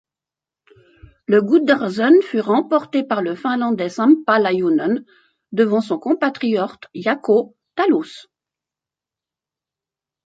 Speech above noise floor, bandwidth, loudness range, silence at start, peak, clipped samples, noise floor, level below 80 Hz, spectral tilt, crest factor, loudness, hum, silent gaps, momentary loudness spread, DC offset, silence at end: 71 dB; 7.8 kHz; 5 LU; 1.3 s; -2 dBFS; under 0.1%; -88 dBFS; -64 dBFS; -6.5 dB/octave; 18 dB; -18 LUFS; none; none; 9 LU; under 0.1%; 2.05 s